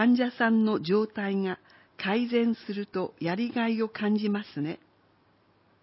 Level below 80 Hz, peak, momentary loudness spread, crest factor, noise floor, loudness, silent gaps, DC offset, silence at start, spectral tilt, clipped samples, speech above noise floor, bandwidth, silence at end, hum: -74 dBFS; -12 dBFS; 10 LU; 16 dB; -65 dBFS; -28 LUFS; none; under 0.1%; 0 s; -10.5 dB/octave; under 0.1%; 38 dB; 5.8 kHz; 1.05 s; none